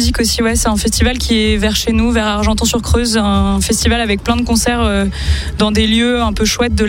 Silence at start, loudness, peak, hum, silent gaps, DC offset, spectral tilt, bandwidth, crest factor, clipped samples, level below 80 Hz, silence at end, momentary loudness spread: 0 s; -13 LUFS; 0 dBFS; none; none; under 0.1%; -4 dB/octave; 17.5 kHz; 12 dB; under 0.1%; -20 dBFS; 0 s; 3 LU